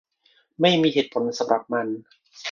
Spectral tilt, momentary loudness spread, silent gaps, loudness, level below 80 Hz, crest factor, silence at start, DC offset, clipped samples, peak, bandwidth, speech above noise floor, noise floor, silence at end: -5 dB/octave; 14 LU; none; -22 LUFS; -68 dBFS; 20 dB; 0.6 s; under 0.1%; under 0.1%; -4 dBFS; 7.4 kHz; 41 dB; -63 dBFS; 0 s